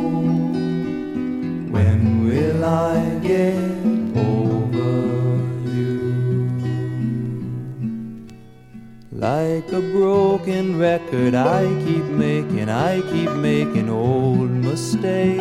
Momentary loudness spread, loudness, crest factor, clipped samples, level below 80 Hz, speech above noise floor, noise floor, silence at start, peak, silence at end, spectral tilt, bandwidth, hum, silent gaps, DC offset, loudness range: 8 LU; -20 LUFS; 16 dB; under 0.1%; -50 dBFS; 23 dB; -41 dBFS; 0 s; -4 dBFS; 0 s; -8 dB/octave; 13 kHz; none; none; under 0.1%; 6 LU